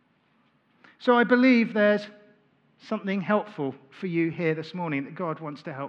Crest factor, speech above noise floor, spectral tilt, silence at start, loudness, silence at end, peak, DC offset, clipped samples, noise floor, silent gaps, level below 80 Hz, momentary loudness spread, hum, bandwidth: 20 dB; 41 dB; -7.5 dB/octave; 1 s; -25 LUFS; 0 s; -6 dBFS; under 0.1%; under 0.1%; -66 dBFS; none; -84 dBFS; 15 LU; none; 6.6 kHz